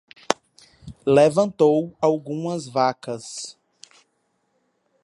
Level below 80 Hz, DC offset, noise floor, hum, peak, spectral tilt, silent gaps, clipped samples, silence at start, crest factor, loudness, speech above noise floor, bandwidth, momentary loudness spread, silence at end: -60 dBFS; under 0.1%; -70 dBFS; none; 0 dBFS; -5.5 dB/octave; none; under 0.1%; 0.3 s; 24 dB; -21 LUFS; 50 dB; 11.5 kHz; 16 LU; 1.5 s